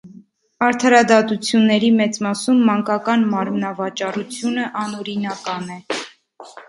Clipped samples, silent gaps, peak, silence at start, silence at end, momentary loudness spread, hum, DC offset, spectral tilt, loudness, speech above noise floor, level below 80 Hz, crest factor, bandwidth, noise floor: under 0.1%; none; 0 dBFS; 0.05 s; 0.05 s; 13 LU; none; under 0.1%; -4.5 dB/octave; -18 LUFS; 28 dB; -66 dBFS; 18 dB; 11.5 kHz; -46 dBFS